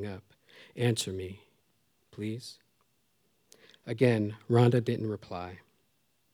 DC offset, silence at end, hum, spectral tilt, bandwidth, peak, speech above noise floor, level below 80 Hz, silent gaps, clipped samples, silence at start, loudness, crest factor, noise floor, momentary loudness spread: under 0.1%; 0.75 s; none; -6.5 dB/octave; 15 kHz; -10 dBFS; 45 dB; -72 dBFS; none; under 0.1%; 0 s; -30 LUFS; 22 dB; -74 dBFS; 22 LU